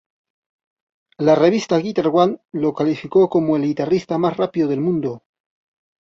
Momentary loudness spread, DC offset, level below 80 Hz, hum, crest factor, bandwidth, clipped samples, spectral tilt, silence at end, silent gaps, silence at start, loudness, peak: 7 LU; under 0.1%; -60 dBFS; none; 18 dB; 7.6 kHz; under 0.1%; -7 dB/octave; 0.85 s; none; 1.2 s; -18 LUFS; -2 dBFS